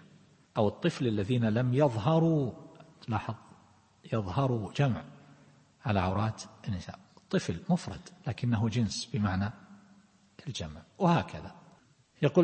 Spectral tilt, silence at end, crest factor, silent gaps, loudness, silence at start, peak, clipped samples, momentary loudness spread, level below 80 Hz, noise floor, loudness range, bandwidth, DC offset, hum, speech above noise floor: -7 dB/octave; 0 s; 20 dB; none; -31 LUFS; 0.55 s; -12 dBFS; under 0.1%; 16 LU; -60 dBFS; -63 dBFS; 5 LU; 8.8 kHz; under 0.1%; none; 33 dB